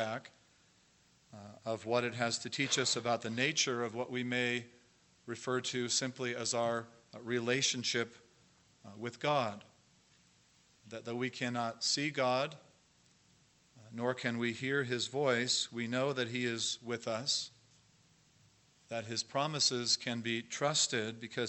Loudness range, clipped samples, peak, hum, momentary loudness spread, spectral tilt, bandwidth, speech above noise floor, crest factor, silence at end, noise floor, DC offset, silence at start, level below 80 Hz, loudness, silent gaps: 4 LU; under 0.1%; -16 dBFS; none; 13 LU; -3 dB/octave; 8.6 kHz; 33 dB; 22 dB; 0 s; -68 dBFS; under 0.1%; 0 s; -80 dBFS; -34 LUFS; none